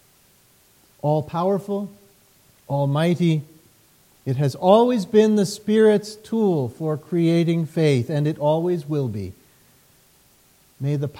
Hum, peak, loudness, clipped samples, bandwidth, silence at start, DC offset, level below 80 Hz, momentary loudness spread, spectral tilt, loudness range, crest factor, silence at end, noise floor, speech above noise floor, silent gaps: none; -2 dBFS; -21 LUFS; under 0.1%; 16.5 kHz; 1.05 s; under 0.1%; -64 dBFS; 12 LU; -7.5 dB/octave; 6 LU; 18 dB; 0 s; -57 dBFS; 37 dB; none